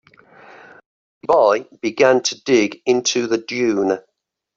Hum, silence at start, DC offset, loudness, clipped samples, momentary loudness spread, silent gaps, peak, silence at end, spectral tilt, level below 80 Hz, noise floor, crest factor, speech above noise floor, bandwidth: none; 1.25 s; under 0.1%; -18 LUFS; under 0.1%; 7 LU; none; -2 dBFS; 0.55 s; -3 dB/octave; -62 dBFS; -46 dBFS; 16 dB; 29 dB; 7.6 kHz